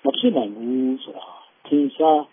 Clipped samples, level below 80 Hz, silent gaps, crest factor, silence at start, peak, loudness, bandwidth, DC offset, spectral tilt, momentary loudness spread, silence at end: under 0.1%; -84 dBFS; none; 18 dB; 0.05 s; -4 dBFS; -21 LUFS; 3.7 kHz; under 0.1%; -9.5 dB/octave; 19 LU; 0.05 s